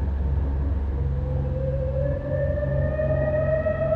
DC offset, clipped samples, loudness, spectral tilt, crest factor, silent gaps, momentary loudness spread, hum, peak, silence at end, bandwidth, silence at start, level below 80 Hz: under 0.1%; under 0.1%; -25 LUFS; -11 dB/octave; 12 dB; none; 4 LU; none; -12 dBFS; 0 s; 4 kHz; 0 s; -28 dBFS